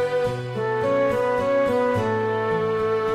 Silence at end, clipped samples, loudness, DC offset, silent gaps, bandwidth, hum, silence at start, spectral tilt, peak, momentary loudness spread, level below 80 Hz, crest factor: 0 s; under 0.1%; -22 LUFS; under 0.1%; none; 13.5 kHz; none; 0 s; -7 dB/octave; -12 dBFS; 4 LU; -52 dBFS; 10 dB